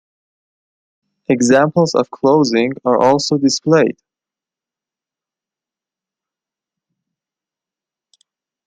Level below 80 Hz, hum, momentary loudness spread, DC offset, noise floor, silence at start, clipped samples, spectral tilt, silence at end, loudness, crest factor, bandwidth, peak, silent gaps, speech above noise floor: -62 dBFS; none; 5 LU; under 0.1%; -88 dBFS; 1.3 s; under 0.1%; -5 dB/octave; 4.75 s; -14 LUFS; 18 dB; 9.4 kHz; 0 dBFS; none; 75 dB